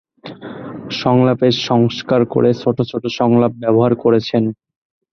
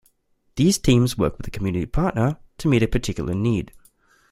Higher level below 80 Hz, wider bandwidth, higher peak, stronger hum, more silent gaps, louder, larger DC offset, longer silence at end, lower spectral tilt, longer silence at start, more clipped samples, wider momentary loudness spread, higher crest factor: second, -54 dBFS vs -36 dBFS; second, 6.6 kHz vs 15 kHz; about the same, -2 dBFS vs -4 dBFS; neither; neither; first, -15 LUFS vs -22 LUFS; neither; about the same, 0.6 s vs 0.65 s; first, -7.5 dB/octave vs -6 dB/octave; second, 0.25 s vs 0.55 s; neither; first, 16 LU vs 9 LU; about the same, 14 dB vs 18 dB